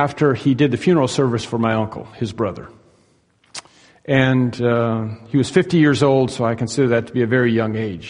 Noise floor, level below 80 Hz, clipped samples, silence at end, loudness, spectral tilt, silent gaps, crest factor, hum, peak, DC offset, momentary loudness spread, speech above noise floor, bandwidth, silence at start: -58 dBFS; -52 dBFS; under 0.1%; 0 s; -18 LUFS; -6.5 dB/octave; none; 18 dB; none; 0 dBFS; under 0.1%; 12 LU; 41 dB; 10.5 kHz; 0 s